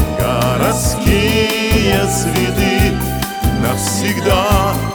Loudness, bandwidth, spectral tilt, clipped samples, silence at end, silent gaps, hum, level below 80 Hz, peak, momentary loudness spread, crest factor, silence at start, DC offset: -14 LUFS; over 20 kHz; -4.5 dB/octave; under 0.1%; 0 s; none; none; -24 dBFS; -2 dBFS; 4 LU; 12 dB; 0 s; under 0.1%